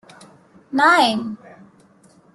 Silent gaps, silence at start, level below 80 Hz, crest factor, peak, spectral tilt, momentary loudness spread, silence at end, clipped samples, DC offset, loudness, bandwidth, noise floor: none; 0.7 s; -68 dBFS; 18 dB; -2 dBFS; -3.5 dB/octave; 19 LU; 1 s; under 0.1%; under 0.1%; -17 LUFS; 12.5 kHz; -53 dBFS